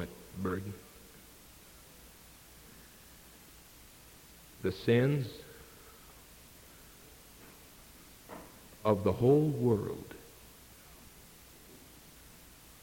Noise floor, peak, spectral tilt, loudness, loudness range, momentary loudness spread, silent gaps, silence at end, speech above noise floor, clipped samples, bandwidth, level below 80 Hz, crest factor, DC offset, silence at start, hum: -56 dBFS; -14 dBFS; -7 dB/octave; -32 LUFS; 20 LU; 26 LU; none; 1.05 s; 26 dB; under 0.1%; 17 kHz; -62 dBFS; 22 dB; under 0.1%; 0 s; none